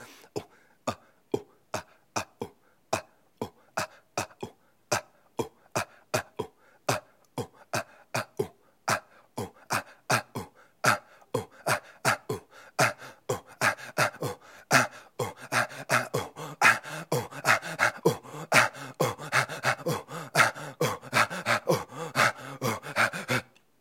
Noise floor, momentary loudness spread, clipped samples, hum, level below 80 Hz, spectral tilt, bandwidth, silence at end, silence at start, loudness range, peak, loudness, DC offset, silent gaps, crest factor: -48 dBFS; 16 LU; under 0.1%; none; -70 dBFS; -3 dB/octave; 16.5 kHz; 0.4 s; 0 s; 10 LU; -4 dBFS; -29 LUFS; under 0.1%; none; 28 dB